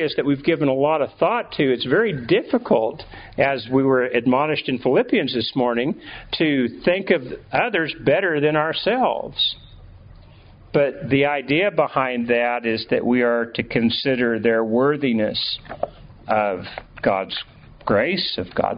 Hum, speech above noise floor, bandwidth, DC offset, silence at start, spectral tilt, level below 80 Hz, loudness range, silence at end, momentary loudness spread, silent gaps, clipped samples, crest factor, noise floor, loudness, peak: none; 25 dB; 5.2 kHz; under 0.1%; 0 s; -3.5 dB/octave; -52 dBFS; 2 LU; 0 s; 7 LU; none; under 0.1%; 18 dB; -46 dBFS; -20 LUFS; -2 dBFS